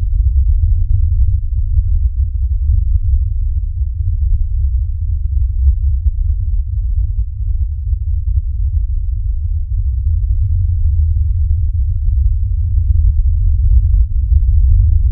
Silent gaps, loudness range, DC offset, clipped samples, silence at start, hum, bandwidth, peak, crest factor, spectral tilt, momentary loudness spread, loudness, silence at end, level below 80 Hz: none; 4 LU; under 0.1%; under 0.1%; 0 s; none; 0.3 kHz; 0 dBFS; 12 dB; -14 dB/octave; 6 LU; -17 LUFS; 0 s; -14 dBFS